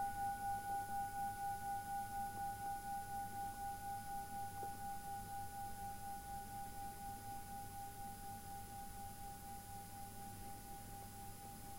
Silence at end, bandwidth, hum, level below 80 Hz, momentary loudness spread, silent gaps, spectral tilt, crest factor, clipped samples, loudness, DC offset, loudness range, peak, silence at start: 0 s; 16.5 kHz; none; -60 dBFS; 9 LU; none; -3.5 dB/octave; 14 dB; under 0.1%; -48 LUFS; under 0.1%; 7 LU; -34 dBFS; 0 s